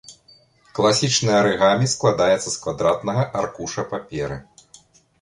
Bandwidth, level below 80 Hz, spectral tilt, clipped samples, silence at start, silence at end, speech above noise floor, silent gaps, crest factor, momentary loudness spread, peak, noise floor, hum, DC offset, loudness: 11.5 kHz; -52 dBFS; -4 dB/octave; under 0.1%; 0.1 s; 0.8 s; 34 dB; none; 18 dB; 12 LU; -4 dBFS; -54 dBFS; none; under 0.1%; -20 LUFS